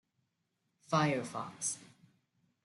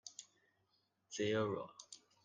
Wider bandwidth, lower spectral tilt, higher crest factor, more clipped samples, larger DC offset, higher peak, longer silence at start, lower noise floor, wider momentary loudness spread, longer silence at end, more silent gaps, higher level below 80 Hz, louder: first, 12 kHz vs 9.6 kHz; about the same, -4 dB/octave vs -4.5 dB/octave; about the same, 22 dB vs 18 dB; neither; neither; first, -16 dBFS vs -26 dBFS; first, 0.9 s vs 0.05 s; about the same, -82 dBFS vs -81 dBFS; second, 11 LU vs 19 LU; first, 0.8 s vs 0.3 s; neither; first, -78 dBFS vs -84 dBFS; first, -35 LUFS vs -40 LUFS